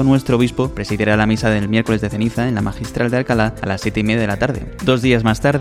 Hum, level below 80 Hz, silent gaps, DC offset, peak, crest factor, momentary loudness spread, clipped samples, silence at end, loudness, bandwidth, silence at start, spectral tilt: none; -34 dBFS; none; under 0.1%; 0 dBFS; 16 dB; 6 LU; under 0.1%; 0 s; -17 LUFS; 15 kHz; 0 s; -6.5 dB/octave